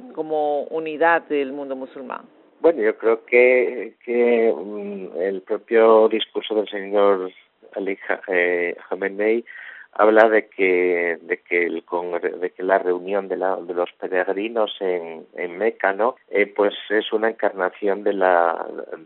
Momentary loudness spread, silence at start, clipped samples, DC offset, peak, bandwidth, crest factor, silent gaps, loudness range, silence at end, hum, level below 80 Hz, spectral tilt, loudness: 14 LU; 0 s; under 0.1%; under 0.1%; 0 dBFS; 4.2 kHz; 20 dB; none; 4 LU; 0 s; none; -72 dBFS; -2 dB/octave; -21 LUFS